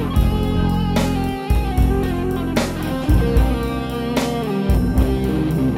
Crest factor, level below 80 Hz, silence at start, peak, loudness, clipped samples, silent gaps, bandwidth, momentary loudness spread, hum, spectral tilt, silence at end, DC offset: 14 dB; -22 dBFS; 0 s; -4 dBFS; -20 LUFS; under 0.1%; none; 16 kHz; 4 LU; none; -7 dB/octave; 0 s; under 0.1%